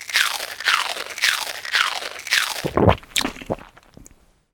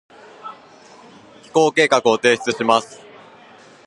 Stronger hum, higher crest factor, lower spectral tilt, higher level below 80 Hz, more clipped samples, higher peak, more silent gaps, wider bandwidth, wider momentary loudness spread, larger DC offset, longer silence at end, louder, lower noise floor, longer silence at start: neither; about the same, 24 dB vs 20 dB; about the same, -2.5 dB/octave vs -3.5 dB/octave; first, -40 dBFS vs -66 dBFS; neither; about the same, 0 dBFS vs 0 dBFS; neither; first, over 20 kHz vs 11 kHz; second, 9 LU vs 22 LU; neither; second, 0.5 s vs 0.9 s; second, -21 LUFS vs -17 LUFS; first, -52 dBFS vs -46 dBFS; second, 0 s vs 0.45 s